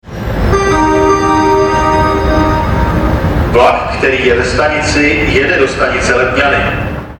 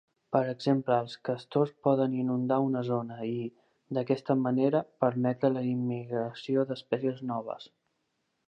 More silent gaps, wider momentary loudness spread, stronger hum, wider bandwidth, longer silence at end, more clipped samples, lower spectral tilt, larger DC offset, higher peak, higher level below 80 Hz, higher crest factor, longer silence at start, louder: neither; second, 3 LU vs 8 LU; neither; first, 18 kHz vs 8.6 kHz; second, 0.05 s vs 0.8 s; neither; second, -5.5 dB/octave vs -8.5 dB/octave; neither; first, 0 dBFS vs -10 dBFS; first, -20 dBFS vs -80 dBFS; second, 10 dB vs 20 dB; second, 0.05 s vs 0.3 s; first, -11 LUFS vs -30 LUFS